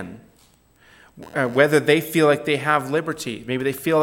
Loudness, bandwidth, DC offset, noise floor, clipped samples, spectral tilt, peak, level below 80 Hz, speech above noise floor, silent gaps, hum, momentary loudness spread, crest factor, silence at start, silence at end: -20 LUFS; 17 kHz; under 0.1%; -56 dBFS; under 0.1%; -5 dB/octave; -2 dBFS; -62 dBFS; 37 dB; none; none; 11 LU; 20 dB; 0 s; 0 s